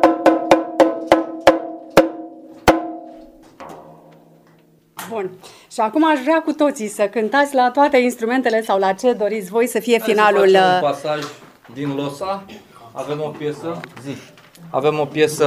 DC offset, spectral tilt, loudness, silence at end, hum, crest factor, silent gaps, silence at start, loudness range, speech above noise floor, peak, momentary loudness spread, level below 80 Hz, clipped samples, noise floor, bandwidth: under 0.1%; -4.5 dB/octave; -18 LUFS; 0 s; none; 18 dB; none; 0 s; 10 LU; 35 dB; 0 dBFS; 18 LU; -50 dBFS; under 0.1%; -53 dBFS; 16 kHz